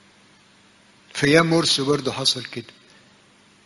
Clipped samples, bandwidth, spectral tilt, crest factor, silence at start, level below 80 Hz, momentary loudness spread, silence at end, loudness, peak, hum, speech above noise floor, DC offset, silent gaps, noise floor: under 0.1%; 11.5 kHz; -4 dB/octave; 24 dB; 1.15 s; -56 dBFS; 18 LU; 1.05 s; -19 LUFS; 0 dBFS; 50 Hz at -60 dBFS; 34 dB; under 0.1%; none; -55 dBFS